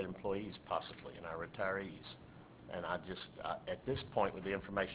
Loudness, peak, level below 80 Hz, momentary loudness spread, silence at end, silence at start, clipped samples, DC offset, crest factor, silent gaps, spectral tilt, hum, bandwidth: -42 LUFS; -20 dBFS; -62 dBFS; 13 LU; 0 s; 0 s; under 0.1%; under 0.1%; 22 dB; none; -3.5 dB/octave; none; 4 kHz